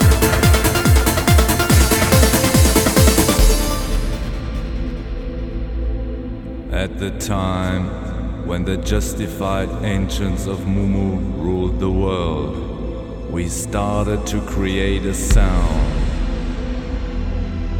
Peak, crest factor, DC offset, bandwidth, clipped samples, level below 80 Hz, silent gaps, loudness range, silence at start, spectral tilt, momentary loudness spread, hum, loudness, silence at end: -2 dBFS; 16 dB; under 0.1%; over 20 kHz; under 0.1%; -20 dBFS; none; 10 LU; 0 s; -5 dB/octave; 13 LU; none; -19 LUFS; 0 s